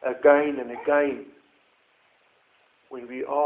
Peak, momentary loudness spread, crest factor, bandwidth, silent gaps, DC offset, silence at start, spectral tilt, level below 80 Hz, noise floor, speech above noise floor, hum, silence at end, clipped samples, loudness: -4 dBFS; 20 LU; 22 dB; 3.8 kHz; none; under 0.1%; 0.05 s; -8.5 dB/octave; -70 dBFS; -64 dBFS; 41 dB; none; 0 s; under 0.1%; -23 LUFS